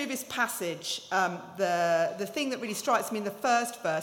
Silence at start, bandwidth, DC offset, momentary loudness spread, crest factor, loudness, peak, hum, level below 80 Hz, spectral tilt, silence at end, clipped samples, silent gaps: 0 s; 18 kHz; under 0.1%; 6 LU; 18 dB; -29 LUFS; -12 dBFS; none; -76 dBFS; -3 dB/octave; 0 s; under 0.1%; none